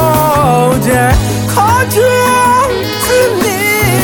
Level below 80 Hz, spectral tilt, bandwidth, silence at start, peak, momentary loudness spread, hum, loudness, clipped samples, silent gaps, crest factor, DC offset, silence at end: -26 dBFS; -4.5 dB/octave; 17.5 kHz; 0 s; 0 dBFS; 3 LU; none; -10 LUFS; under 0.1%; none; 10 dB; under 0.1%; 0 s